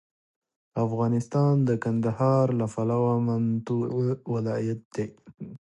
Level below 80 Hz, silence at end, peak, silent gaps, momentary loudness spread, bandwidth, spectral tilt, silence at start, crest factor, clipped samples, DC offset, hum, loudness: -62 dBFS; 0.15 s; -12 dBFS; 4.85-4.91 s; 12 LU; 9.4 kHz; -9 dB/octave; 0.75 s; 14 dB; under 0.1%; under 0.1%; none; -26 LUFS